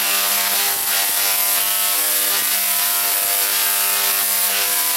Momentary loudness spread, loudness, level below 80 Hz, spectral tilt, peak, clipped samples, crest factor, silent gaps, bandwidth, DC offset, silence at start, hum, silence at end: 1 LU; -15 LUFS; -72 dBFS; 2.5 dB/octave; -4 dBFS; under 0.1%; 16 dB; none; 16 kHz; under 0.1%; 0 s; none; 0 s